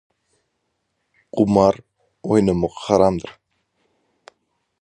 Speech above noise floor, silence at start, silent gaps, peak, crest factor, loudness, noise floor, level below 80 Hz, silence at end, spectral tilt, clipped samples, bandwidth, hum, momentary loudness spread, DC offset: 56 dB; 1.35 s; none; 0 dBFS; 22 dB; -19 LUFS; -73 dBFS; -48 dBFS; 1.5 s; -7.5 dB/octave; under 0.1%; 10 kHz; none; 15 LU; under 0.1%